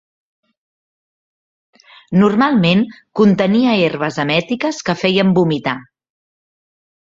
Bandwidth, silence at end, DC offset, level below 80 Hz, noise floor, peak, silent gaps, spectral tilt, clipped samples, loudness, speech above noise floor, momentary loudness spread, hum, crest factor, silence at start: 7.6 kHz; 1.3 s; under 0.1%; -56 dBFS; under -90 dBFS; -2 dBFS; none; -6.5 dB/octave; under 0.1%; -15 LUFS; over 76 dB; 8 LU; none; 16 dB; 2.1 s